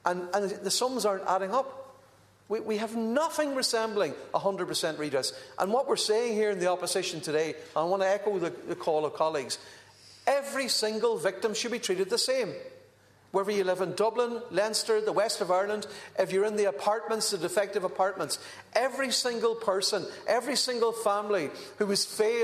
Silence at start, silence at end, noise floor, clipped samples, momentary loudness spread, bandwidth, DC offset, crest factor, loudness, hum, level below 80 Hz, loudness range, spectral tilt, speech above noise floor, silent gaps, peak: 0.05 s; 0 s; -60 dBFS; under 0.1%; 7 LU; 14 kHz; under 0.1%; 18 dB; -29 LUFS; none; -76 dBFS; 2 LU; -2.5 dB/octave; 31 dB; none; -10 dBFS